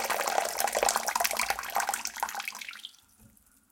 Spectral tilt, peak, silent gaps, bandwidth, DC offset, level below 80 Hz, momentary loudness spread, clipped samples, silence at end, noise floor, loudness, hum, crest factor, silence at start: 1 dB/octave; -6 dBFS; none; 17 kHz; under 0.1%; -64 dBFS; 13 LU; under 0.1%; 0.85 s; -60 dBFS; -29 LUFS; none; 26 dB; 0 s